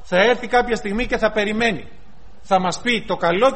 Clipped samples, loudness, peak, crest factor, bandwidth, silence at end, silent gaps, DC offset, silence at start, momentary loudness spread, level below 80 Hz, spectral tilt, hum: under 0.1%; -19 LUFS; -2 dBFS; 18 dB; 8.8 kHz; 0 s; none; 2%; 0.1 s; 6 LU; -40 dBFS; -4.5 dB/octave; none